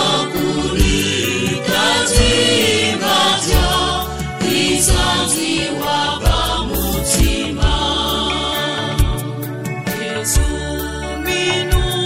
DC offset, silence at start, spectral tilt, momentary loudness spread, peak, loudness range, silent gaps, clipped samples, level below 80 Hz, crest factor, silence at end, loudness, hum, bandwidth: under 0.1%; 0 s; -3.5 dB/octave; 9 LU; 0 dBFS; 5 LU; none; under 0.1%; -22 dBFS; 16 dB; 0 s; -16 LUFS; none; 16.5 kHz